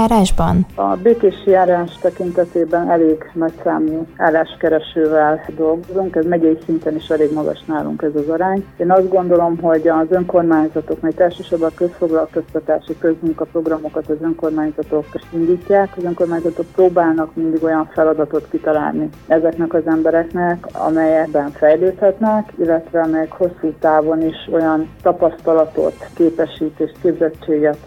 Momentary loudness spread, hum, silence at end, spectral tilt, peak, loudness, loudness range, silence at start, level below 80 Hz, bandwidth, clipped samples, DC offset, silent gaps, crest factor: 7 LU; none; 0 s; -7.5 dB/octave; -2 dBFS; -16 LUFS; 3 LU; 0 s; -38 dBFS; 12 kHz; under 0.1%; under 0.1%; none; 14 dB